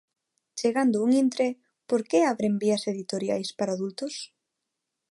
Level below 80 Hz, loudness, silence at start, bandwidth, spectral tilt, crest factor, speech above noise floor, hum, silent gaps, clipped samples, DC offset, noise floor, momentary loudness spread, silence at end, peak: -76 dBFS; -26 LUFS; 0.55 s; 11.5 kHz; -5 dB/octave; 16 dB; 58 dB; none; none; under 0.1%; under 0.1%; -84 dBFS; 12 LU; 0.85 s; -12 dBFS